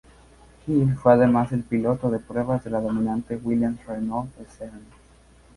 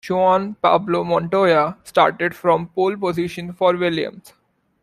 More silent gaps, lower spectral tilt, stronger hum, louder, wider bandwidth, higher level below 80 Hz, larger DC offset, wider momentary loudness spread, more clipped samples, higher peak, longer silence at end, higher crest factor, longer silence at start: neither; first, -9.5 dB/octave vs -6.5 dB/octave; neither; second, -23 LUFS vs -19 LUFS; second, 11.5 kHz vs 15 kHz; first, -50 dBFS vs -58 dBFS; neither; first, 21 LU vs 6 LU; neither; about the same, -2 dBFS vs -2 dBFS; about the same, 0.75 s vs 0.65 s; first, 22 dB vs 16 dB; first, 0.65 s vs 0.05 s